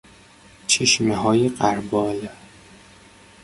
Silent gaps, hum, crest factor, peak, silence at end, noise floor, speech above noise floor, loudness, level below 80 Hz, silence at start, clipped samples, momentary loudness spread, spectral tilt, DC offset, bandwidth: none; none; 20 dB; -2 dBFS; 1.1 s; -49 dBFS; 29 dB; -20 LUFS; -54 dBFS; 0.7 s; under 0.1%; 15 LU; -3.5 dB/octave; under 0.1%; 11.5 kHz